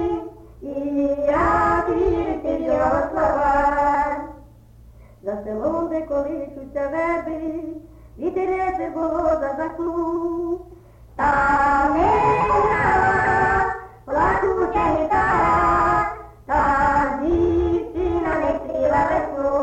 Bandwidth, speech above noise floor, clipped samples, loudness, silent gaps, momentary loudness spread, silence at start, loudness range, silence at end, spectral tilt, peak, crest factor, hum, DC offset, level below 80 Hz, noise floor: 8.6 kHz; 25 dB; under 0.1%; -20 LUFS; none; 12 LU; 0 s; 7 LU; 0 s; -7.5 dB/octave; -8 dBFS; 14 dB; none; under 0.1%; -38 dBFS; -46 dBFS